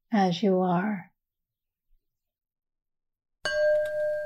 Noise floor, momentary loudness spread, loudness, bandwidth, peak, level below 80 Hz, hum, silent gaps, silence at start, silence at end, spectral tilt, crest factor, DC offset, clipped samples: -86 dBFS; 9 LU; -26 LUFS; 10.5 kHz; -12 dBFS; -64 dBFS; none; none; 0.1 s; 0 s; -6.5 dB/octave; 16 dB; under 0.1%; under 0.1%